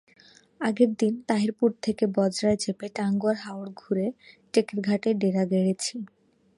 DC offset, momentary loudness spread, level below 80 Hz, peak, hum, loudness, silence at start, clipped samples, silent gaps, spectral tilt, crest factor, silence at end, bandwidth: under 0.1%; 8 LU; -66 dBFS; -8 dBFS; none; -26 LUFS; 0.6 s; under 0.1%; none; -6 dB/octave; 18 dB; 0.5 s; 11.5 kHz